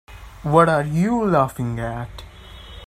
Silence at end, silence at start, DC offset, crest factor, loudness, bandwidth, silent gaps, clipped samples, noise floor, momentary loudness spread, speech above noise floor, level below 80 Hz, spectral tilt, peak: 0.05 s; 0.1 s; under 0.1%; 20 dB; -19 LUFS; 15 kHz; none; under 0.1%; -40 dBFS; 19 LU; 21 dB; -42 dBFS; -7.5 dB/octave; 0 dBFS